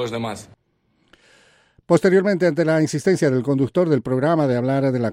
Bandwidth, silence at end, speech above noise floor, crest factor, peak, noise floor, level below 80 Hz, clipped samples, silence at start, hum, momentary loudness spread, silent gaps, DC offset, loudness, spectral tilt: 13 kHz; 0 s; 46 dB; 16 dB; -4 dBFS; -65 dBFS; -60 dBFS; under 0.1%; 0 s; none; 6 LU; none; under 0.1%; -19 LUFS; -7 dB/octave